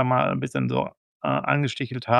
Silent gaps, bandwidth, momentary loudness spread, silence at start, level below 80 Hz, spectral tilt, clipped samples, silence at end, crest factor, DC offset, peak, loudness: 0.97-1.20 s; 10.5 kHz; 8 LU; 0 s; -62 dBFS; -7 dB/octave; under 0.1%; 0 s; 20 dB; under 0.1%; -4 dBFS; -25 LUFS